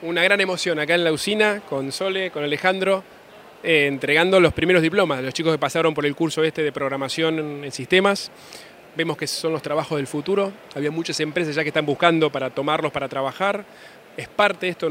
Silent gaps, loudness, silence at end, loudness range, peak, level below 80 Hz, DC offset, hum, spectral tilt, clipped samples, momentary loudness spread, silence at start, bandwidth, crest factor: none; -21 LUFS; 0 s; 4 LU; 0 dBFS; -58 dBFS; under 0.1%; none; -4.5 dB/octave; under 0.1%; 10 LU; 0 s; 16 kHz; 22 dB